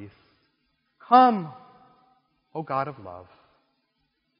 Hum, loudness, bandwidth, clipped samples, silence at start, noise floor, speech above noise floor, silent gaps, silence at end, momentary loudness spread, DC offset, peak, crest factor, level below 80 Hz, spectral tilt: none; -22 LUFS; 5.4 kHz; under 0.1%; 0 s; -74 dBFS; 52 dB; none; 1.2 s; 25 LU; under 0.1%; -4 dBFS; 24 dB; -74 dBFS; -4.5 dB/octave